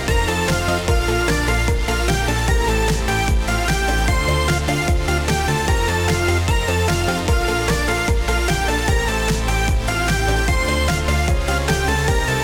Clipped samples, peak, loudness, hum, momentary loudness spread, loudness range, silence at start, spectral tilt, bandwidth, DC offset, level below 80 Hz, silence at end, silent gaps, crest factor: under 0.1%; -4 dBFS; -19 LUFS; none; 1 LU; 0 LU; 0 s; -4.5 dB/octave; 17.5 kHz; under 0.1%; -22 dBFS; 0 s; none; 14 dB